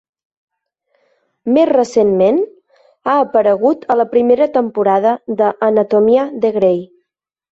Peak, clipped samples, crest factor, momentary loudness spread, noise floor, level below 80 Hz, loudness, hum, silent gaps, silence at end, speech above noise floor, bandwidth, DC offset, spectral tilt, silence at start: -2 dBFS; under 0.1%; 12 dB; 5 LU; -74 dBFS; -58 dBFS; -14 LUFS; none; none; 0.7 s; 61 dB; 8 kHz; under 0.1%; -7 dB/octave; 1.45 s